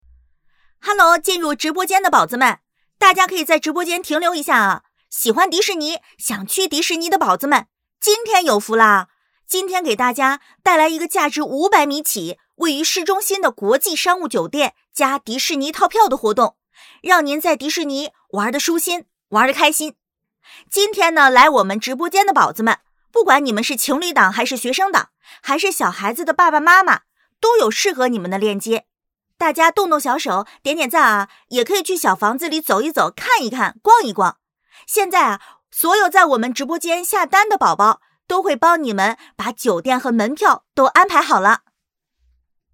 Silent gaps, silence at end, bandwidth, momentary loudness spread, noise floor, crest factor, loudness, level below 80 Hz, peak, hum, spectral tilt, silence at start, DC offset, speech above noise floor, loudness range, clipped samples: none; 1.15 s; over 20 kHz; 9 LU; -77 dBFS; 18 dB; -16 LUFS; -64 dBFS; 0 dBFS; none; -2 dB/octave; 0.85 s; under 0.1%; 61 dB; 3 LU; under 0.1%